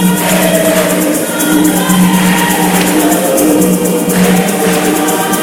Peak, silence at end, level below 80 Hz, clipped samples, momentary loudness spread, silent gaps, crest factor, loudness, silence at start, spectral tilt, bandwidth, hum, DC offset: 0 dBFS; 0 s; -40 dBFS; 0.2%; 3 LU; none; 10 dB; -9 LUFS; 0 s; -4.5 dB/octave; 20 kHz; none; under 0.1%